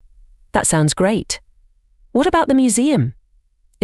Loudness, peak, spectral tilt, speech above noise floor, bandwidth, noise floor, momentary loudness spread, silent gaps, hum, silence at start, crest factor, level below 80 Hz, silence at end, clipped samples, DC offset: -17 LUFS; -2 dBFS; -4.5 dB/octave; 41 dB; 13.5 kHz; -57 dBFS; 9 LU; none; none; 0.55 s; 18 dB; -42 dBFS; 0.7 s; under 0.1%; under 0.1%